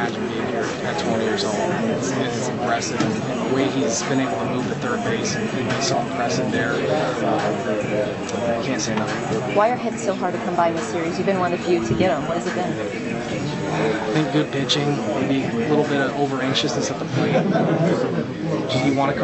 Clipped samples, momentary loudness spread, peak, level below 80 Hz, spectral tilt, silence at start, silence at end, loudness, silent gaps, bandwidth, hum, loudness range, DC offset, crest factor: under 0.1%; 5 LU; -4 dBFS; -50 dBFS; -5 dB/octave; 0 s; 0 s; -22 LUFS; none; 8.4 kHz; none; 2 LU; under 0.1%; 16 dB